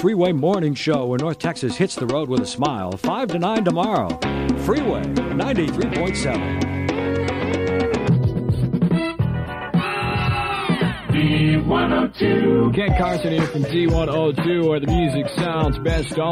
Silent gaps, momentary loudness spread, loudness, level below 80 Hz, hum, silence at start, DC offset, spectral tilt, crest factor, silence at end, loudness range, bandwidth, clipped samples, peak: none; 5 LU; -20 LUFS; -34 dBFS; none; 0 s; under 0.1%; -6.5 dB/octave; 14 dB; 0 s; 3 LU; 13.5 kHz; under 0.1%; -6 dBFS